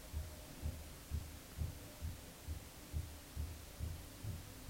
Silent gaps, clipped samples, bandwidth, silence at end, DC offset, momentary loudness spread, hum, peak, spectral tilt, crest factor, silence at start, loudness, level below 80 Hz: none; under 0.1%; 16 kHz; 0 s; under 0.1%; 3 LU; none; -30 dBFS; -5 dB/octave; 18 dB; 0 s; -49 LUFS; -50 dBFS